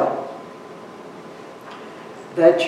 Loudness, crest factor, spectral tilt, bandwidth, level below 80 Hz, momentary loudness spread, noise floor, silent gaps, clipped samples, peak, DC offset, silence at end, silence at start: -21 LUFS; 22 dB; -5.5 dB/octave; 11.5 kHz; -72 dBFS; 21 LU; -38 dBFS; none; under 0.1%; -2 dBFS; under 0.1%; 0 s; 0 s